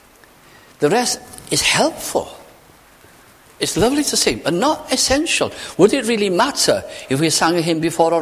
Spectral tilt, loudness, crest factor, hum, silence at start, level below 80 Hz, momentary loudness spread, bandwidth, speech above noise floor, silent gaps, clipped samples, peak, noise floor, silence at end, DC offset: -3 dB/octave; -17 LUFS; 18 dB; none; 0.8 s; -44 dBFS; 8 LU; 16 kHz; 30 dB; none; under 0.1%; 0 dBFS; -47 dBFS; 0 s; under 0.1%